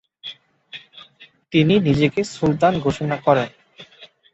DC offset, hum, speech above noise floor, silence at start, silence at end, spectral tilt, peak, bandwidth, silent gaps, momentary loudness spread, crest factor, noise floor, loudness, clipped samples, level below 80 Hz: under 0.1%; none; 32 dB; 0.25 s; 0.3 s; -6.5 dB/octave; -2 dBFS; 8.2 kHz; none; 21 LU; 18 dB; -50 dBFS; -19 LUFS; under 0.1%; -50 dBFS